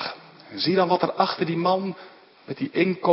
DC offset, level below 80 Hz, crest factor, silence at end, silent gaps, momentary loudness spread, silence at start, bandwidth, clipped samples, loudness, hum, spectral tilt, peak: under 0.1%; -72 dBFS; 20 dB; 0 s; none; 18 LU; 0 s; 5.8 kHz; under 0.1%; -24 LUFS; none; -10 dB/octave; -4 dBFS